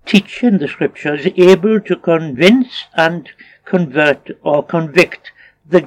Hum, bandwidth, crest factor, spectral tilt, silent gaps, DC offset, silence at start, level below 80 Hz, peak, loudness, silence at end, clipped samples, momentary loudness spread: none; 14 kHz; 14 dB; -6 dB/octave; none; under 0.1%; 0.05 s; -58 dBFS; 0 dBFS; -14 LUFS; 0 s; 0.2%; 9 LU